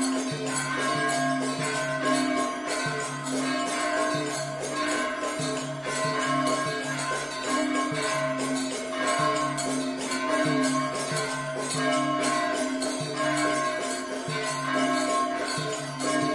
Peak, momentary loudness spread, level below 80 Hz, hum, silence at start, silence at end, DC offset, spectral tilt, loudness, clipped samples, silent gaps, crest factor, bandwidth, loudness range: -12 dBFS; 5 LU; -64 dBFS; none; 0 s; 0 s; under 0.1%; -3.5 dB/octave; -27 LUFS; under 0.1%; none; 14 dB; 11.5 kHz; 1 LU